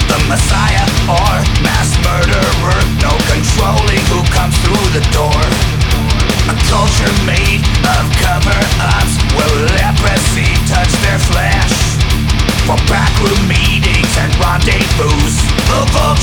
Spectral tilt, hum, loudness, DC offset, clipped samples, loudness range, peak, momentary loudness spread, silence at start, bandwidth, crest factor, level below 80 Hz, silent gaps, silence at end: -4.5 dB/octave; none; -11 LUFS; under 0.1%; under 0.1%; 0 LU; 0 dBFS; 1 LU; 0 s; 19.5 kHz; 10 dB; -16 dBFS; none; 0 s